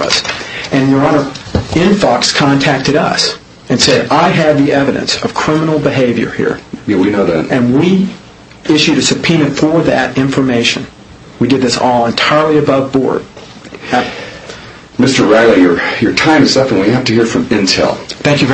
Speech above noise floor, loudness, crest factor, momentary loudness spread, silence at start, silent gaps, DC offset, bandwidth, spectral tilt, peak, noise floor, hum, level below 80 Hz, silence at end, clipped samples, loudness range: 21 dB; -11 LUFS; 12 dB; 11 LU; 0 s; none; under 0.1%; 8.6 kHz; -4.5 dB/octave; 0 dBFS; -31 dBFS; none; -40 dBFS; 0 s; 0.1%; 3 LU